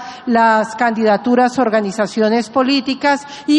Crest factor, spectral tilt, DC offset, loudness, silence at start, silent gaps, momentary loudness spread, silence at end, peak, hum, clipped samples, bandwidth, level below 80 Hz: 12 dB; -4.5 dB/octave; under 0.1%; -15 LUFS; 0 s; none; 4 LU; 0 s; -2 dBFS; none; under 0.1%; 10.5 kHz; -60 dBFS